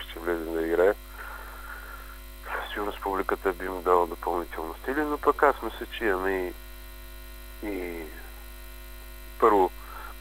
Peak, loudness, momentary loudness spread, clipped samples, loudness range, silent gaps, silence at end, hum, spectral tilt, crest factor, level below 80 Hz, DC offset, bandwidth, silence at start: -6 dBFS; -28 LUFS; 21 LU; under 0.1%; 6 LU; none; 0 s; none; -5 dB/octave; 24 dB; -44 dBFS; under 0.1%; 16 kHz; 0 s